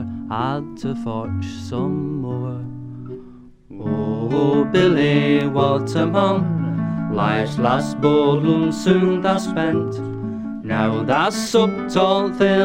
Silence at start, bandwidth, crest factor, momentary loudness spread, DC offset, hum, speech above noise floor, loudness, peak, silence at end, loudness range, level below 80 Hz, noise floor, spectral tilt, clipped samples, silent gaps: 0 s; 16 kHz; 16 dB; 11 LU; under 0.1%; none; 24 dB; -19 LUFS; -2 dBFS; 0 s; 8 LU; -50 dBFS; -42 dBFS; -6.5 dB/octave; under 0.1%; none